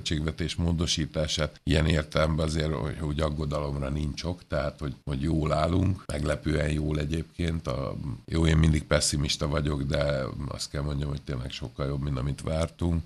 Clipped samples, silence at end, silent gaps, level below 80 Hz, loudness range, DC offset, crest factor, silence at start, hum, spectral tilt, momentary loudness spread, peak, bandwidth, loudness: under 0.1%; 0 s; none; -36 dBFS; 3 LU; under 0.1%; 20 dB; 0 s; none; -5.5 dB/octave; 8 LU; -8 dBFS; 12.5 kHz; -28 LUFS